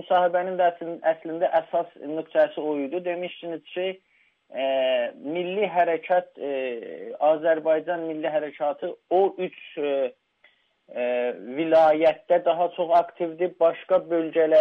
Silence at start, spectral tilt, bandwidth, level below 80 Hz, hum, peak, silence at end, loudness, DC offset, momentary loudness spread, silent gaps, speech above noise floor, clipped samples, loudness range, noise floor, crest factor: 0 s; -7 dB/octave; 5.2 kHz; -74 dBFS; none; -10 dBFS; 0 s; -25 LUFS; under 0.1%; 11 LU; none; 38 dB; under 0.1%; 5 LU; -62 dBFS; 14 dB